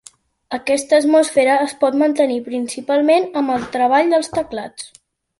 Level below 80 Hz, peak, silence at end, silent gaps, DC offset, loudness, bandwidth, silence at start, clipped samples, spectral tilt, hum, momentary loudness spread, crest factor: -58 dBFS; -2 dBFS; 0.55 s; none; under 0.1%; -17 LUFS; 11.5 kHz; 0.5 s; under 0.1%; -3.5 dB/octave; none; 14 LU; 14 dB